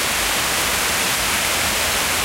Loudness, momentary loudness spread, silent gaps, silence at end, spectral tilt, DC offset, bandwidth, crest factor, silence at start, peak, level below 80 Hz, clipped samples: -17 LUFS; 0 LU; none; 0 s; -0.5 dB/octave; under 0.1%; 16 kHz; 12 dB; 0 s; -6 dBFS; -38 dBFS; under 0.1%